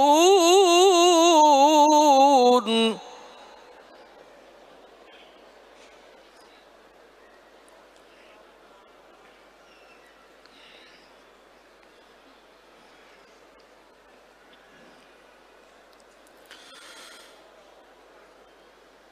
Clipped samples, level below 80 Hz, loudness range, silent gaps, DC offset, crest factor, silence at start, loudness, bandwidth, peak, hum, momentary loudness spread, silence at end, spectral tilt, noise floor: under 0.1%; -74 dBFS; 15 LU; none; under 0.1%; 18 dB; 0 s; -17 LUFS; 15.5 kHz; -6 dBFS; none; 28 LU; 16.15 s; -2 dB/octave; -54 dBFS